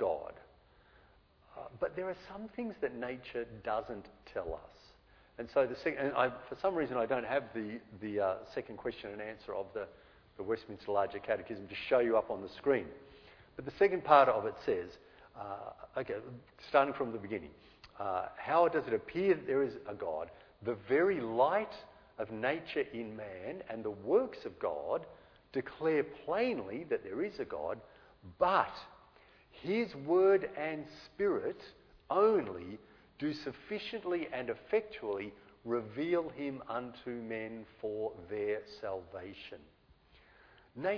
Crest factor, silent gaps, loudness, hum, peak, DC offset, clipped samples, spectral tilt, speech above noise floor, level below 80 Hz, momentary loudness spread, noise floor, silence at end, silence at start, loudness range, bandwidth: 26 dB; none; -35 LUFS; none; -10 dBFS; under 0.1%; under 0.1%; -4 dB/octave; 30 dB; -66 dBFS; 16 LU; -65 dBFS; 0 s; 0 s; 8 LU; 5.4 kHz